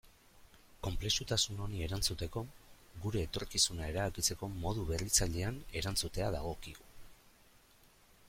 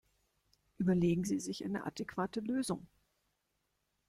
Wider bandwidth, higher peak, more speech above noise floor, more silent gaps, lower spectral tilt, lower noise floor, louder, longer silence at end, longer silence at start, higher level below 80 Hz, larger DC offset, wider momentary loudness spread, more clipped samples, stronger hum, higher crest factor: first, 16.5 kHz vs 14 kHz; first, -16 dBFS vs -20 dBFS; second, 28 dB vs 47 dB; neither; second, -3 dB/octave vs -6 dB/octave; second, -64 dBFS vs -82 dBFS; about the same, -35 LUFS vs -36 LUFS; second, 0.45 s vs 1.25 s; second, 0.05 s vs 0.8 s; first, -48 dBFS vs -66 dBFS; neither; first, 13 LU vs 8 LU; neither; second, none vs 50 Hz at -60 dBFS; about the same, 22 dB vs 18 dB